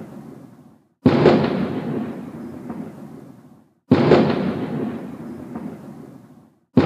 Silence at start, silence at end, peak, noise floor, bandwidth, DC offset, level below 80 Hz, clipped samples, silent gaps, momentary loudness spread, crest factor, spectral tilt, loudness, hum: 0 s; 0 s; 0 dBFS; -50 dBFS; 8.8 kHz; under 0.1%; -54 dBFS; under 0.1%; none; 24 LU; 22 dB; -8.5 dB/octave; -19 LUFS; none